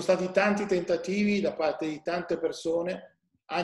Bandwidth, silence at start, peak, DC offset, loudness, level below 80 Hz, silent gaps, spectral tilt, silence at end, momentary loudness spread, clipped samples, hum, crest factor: 12 kHz; 0 s; -10 dBFS; under 0.1%; -28 LUFS; -64 dBFS; none; -5.5 dB/octave; 0 s; 8 LU; under 0.1%; none; 18 dB